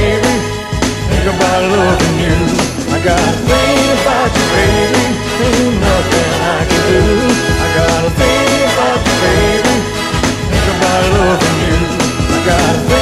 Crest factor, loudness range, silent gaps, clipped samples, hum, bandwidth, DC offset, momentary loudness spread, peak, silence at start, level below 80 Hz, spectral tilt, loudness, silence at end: 12 dB; 1 LU; none; under 0.1%; none; 15.5 kHz; under 0.1%; 4 LU; 0 dBFS; 0 s; -22 dBFS; -4.5 dB/octave; -12 LUFS; 0 s